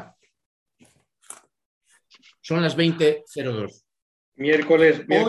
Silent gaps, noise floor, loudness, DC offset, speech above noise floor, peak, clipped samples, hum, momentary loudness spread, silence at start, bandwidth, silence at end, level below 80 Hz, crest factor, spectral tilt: 0.46-0.66 s, 1.65-1.81 s, 4.02-4.32 s; -60 dBFS; -21 LUFS; under 0.1%; 40 dB; -4 dBFS; under 0.1%; none; 26 LU; 0 s; 12 kHz; 0 s; -64 dBFS; 20 dB; -6 dB/octave